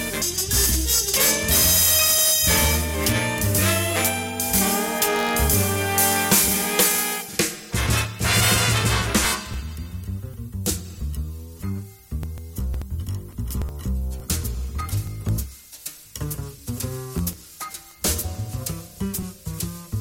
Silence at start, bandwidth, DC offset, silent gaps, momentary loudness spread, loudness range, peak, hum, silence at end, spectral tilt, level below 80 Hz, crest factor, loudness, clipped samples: 0 s; 17 kHz; under 0.1%; none; 17 LU; 13 LU; -6 dBFS; none; 0 s; -2.5 dB/octave; -34 dBFS; 18 dB; -21 LUFS; under 0.1%